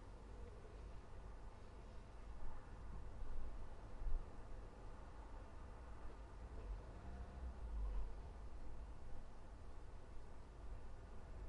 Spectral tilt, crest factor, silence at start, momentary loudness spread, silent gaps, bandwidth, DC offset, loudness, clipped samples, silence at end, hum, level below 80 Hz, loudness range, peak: -7 dB/octave; 20 dB; 0 s; 8 LU; none; 9.4 kHz; under 0.1%; -57 LUFS; under 0.1%; 0 s; none; -52 dBFS; 4 LU; -28 dBFS